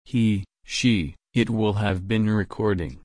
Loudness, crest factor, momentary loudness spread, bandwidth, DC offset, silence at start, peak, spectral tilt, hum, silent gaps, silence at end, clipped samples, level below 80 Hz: -24 LUFS; 14 dB; 5 LU; 10.5 kHz; under 0.1%; 0.1 s; -8 dBFS; -6 dB/octave; none; none; 0.05 s; under 0.1%; -44 dBFS